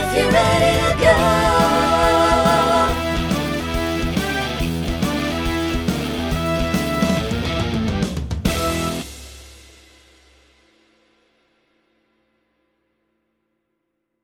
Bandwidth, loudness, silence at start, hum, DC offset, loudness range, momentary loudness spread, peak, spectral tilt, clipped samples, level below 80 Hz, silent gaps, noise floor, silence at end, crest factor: over 20 kHz; -18 LUFS; 0 s; none; under 0.1%; 11 LU; 8 LU; 0 dBFS; -5 dB/octave; under 0.1%; -32 dBFS; none; -74 dBFS; 4.65 s; 20 dB